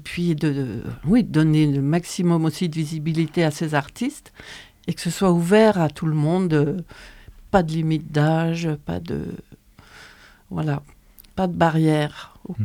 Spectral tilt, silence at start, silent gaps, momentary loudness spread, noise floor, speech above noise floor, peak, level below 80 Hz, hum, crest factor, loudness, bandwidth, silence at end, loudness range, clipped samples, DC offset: -7 dB/octave; 0 s; none; 15 LU; -48 dBFS; 27 dB; -4 dBFS; -48 dBFS; none; 18 dB; -21 LUFS; 15 kHz; 0 s; 5 LU; under 0.1%; under 0.1%